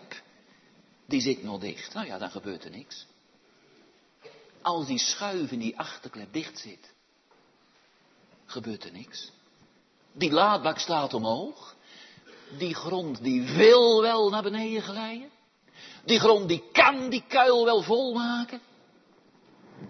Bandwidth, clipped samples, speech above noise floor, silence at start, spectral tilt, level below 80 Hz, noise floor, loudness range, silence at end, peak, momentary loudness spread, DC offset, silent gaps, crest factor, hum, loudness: 6.4 kHz; under 0.1%; 38 dB; 0.1 s; -3.5 dB/octave; -74 dBFS; -64 dBFS; 17 LU; 0 s; -6 dBFS; 23 LU; under 0.1%; none; 22 dB; none; -25 LUFS